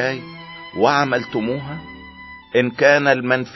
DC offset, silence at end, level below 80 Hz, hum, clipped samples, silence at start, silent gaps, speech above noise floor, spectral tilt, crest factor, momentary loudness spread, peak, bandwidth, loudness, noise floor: under 0.1%; 0 s; -54 dBFS; none; under 0.1%; 0 s; none; 21 dB; -5.5 dB/octave; 18 dB; 22 LU; -2 dBFS; 6 kHz; -18 LUFS; -39 dBFS